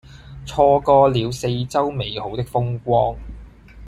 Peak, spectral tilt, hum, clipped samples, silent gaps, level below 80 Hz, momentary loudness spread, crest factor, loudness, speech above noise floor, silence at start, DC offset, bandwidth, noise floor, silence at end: -2 dBFS; -6.5 dB/octave; none; under 0.1%; none; -40 dBFS; 14 LU; 18 dB; -19 LUFS; 22 dB; 0.1 s; under 0.1%; 13.5 kHz; -40 dBFS; 0 s